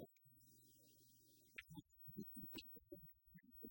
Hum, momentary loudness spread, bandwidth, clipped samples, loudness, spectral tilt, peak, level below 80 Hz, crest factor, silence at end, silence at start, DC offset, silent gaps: none; 15 LU; 16.5 kHz; under 0.1%; -58 LUFS; -4.5 dB/octave; -38 dBFS; -80 dBFS; 22 dB; 0 s; 0 s; under 0.1%; none